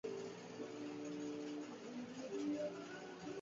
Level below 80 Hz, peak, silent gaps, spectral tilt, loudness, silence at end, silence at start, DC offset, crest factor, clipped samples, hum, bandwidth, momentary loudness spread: -84 dBFS; -32 dBFS; none; -4.5 dB/octave; -47 LUFS; 0 s; 0.05 s; under 0.1%; 14 dB; under 0.1%; none; 7.6 kHz; 7 LU